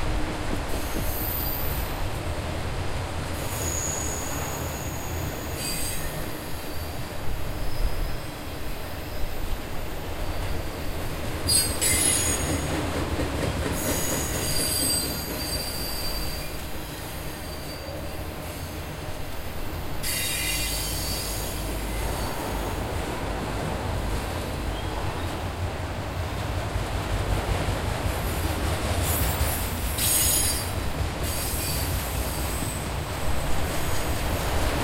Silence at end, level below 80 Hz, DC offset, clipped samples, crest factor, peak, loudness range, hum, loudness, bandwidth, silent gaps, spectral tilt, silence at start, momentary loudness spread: 0 s; -34 dBFS; under 0.1%; under 0.1%; 18 dB; -8 dBFS; 9 LU; none; -28 LUFS; 16 kHz; none; -3.5 dB/octave; 0 s; 12 LU